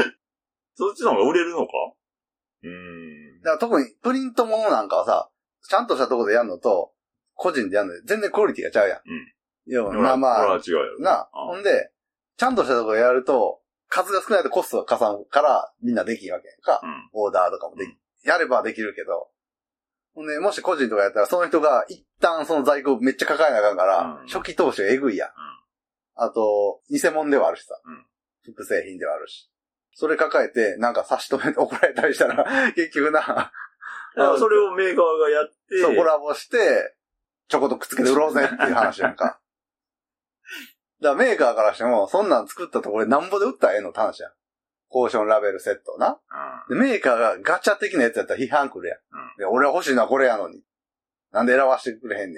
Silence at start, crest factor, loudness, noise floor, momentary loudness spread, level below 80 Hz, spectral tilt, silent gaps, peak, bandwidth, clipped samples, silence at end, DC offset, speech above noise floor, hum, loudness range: 0 s; 22 dB; -21 LUFS; under -90 dBFS; 14 LU; -68 dBFS; -4 dB/octave; none; 0 dBFS; 15.5 kHz; under 0.1%; 0 s; under 0.1%; over 69 dB; none; 4 LU